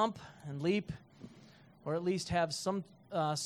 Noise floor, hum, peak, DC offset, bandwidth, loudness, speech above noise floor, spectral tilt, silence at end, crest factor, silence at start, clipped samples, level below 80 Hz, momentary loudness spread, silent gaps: -59 dBFS; none; -18 dBFS; under 0.1%; 14.5 kHz; -36 LUFS; 24 dB; -5 dB/octave; 0 s; 18 dB; 0 s; under 0.1%; -64 dBFS; 16 LU; none